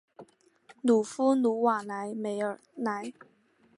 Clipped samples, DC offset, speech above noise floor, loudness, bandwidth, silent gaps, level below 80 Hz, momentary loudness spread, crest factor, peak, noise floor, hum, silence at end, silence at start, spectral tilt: under 0.1%; under 0.1%; 31 dB; -29 LUFS; 11.5 kHz; none; -80 dBFS; 10 LU; 18 dB; -14 dBFS; -60 dBFS; none; 0.65 s; 0.2 s; -5.5 dB/octave